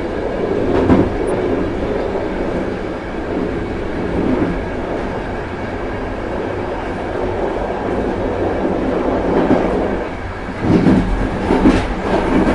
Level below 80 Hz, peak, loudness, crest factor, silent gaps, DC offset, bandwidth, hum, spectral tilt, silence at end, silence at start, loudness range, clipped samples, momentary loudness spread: -28 dBFS; 0 dBFS; -18 LUFS; 16 dB; none; under 0.1%; 11 kHz; none; -7.5 dB/octave; 0 s; 0 s; 5 LU; under 0.1%; 9 LU